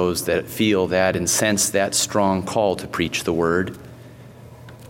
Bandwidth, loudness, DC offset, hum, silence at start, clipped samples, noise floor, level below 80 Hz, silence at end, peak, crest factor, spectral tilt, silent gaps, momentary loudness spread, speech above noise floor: 16.5 kHz; -20 LUFS; under 0.1%; none; 0 s; under 0.1%; -42 dBFS; -50 dBFS; 0 s; -2 dBFS; 18 dB; -3.5 dB/octave; none; 5 LU; 21 dB